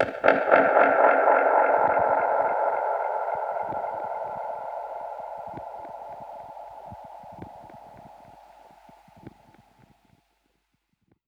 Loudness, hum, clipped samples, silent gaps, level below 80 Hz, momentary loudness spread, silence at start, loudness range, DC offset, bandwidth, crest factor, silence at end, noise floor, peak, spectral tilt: -23 LUFS; none; under 0.1%; none; -64 dBFS; 24 LU; 0 s; 24 LU; under 0.1%; 6.2 kHz; 24 dB; 2 s; -74 dBFS; -2 dBFS; -6.5 dB/octave